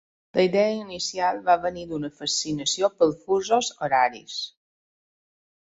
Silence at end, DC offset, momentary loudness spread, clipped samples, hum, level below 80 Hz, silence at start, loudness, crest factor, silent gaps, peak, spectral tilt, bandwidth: 1.1 s; under 0.1%; 11 LU; under 0.1%; none; -62 dBFS; 0.35 s; -24 LUFS; 18 dB; none; -8 dBFS; -3 dB/octave; 8 kHz